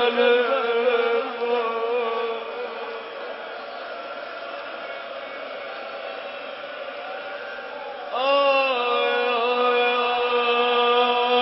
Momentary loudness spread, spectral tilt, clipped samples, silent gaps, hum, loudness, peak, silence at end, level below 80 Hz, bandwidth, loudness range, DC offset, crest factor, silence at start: 15 LU; -6 dB/octave; under 0.1%; none; none; -24 LUFS; -6 dBFS; 0 s; -76 dBFS; 5.8 kHz; 13 LU; under 0.1%; 18 dB; 0 s